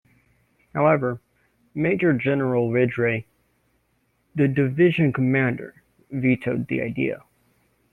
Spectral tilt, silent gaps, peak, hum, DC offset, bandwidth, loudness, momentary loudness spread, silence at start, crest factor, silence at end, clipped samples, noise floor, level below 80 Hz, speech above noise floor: -9.5 dB/octave; none; -6 dBFS; none; under 0.1%; 4 kHz; -22 LUFS; 14 LU; 0.75 s; 18 dB; 0.75 s; under 0.1%; -68 dBFS; -58 dBFS; 47 dB